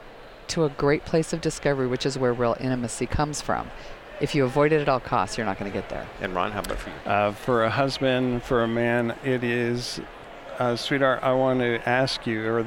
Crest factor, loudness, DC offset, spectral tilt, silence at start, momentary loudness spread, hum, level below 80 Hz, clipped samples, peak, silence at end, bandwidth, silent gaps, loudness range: 16 dB; -25 LUFS; under 0.1%; -5.5 dB/octave; 0 s; 10 LU; none; -44 dBFS; under 0.1%; -8 dBFS; 0 s; 17 kHz; none; 2 LU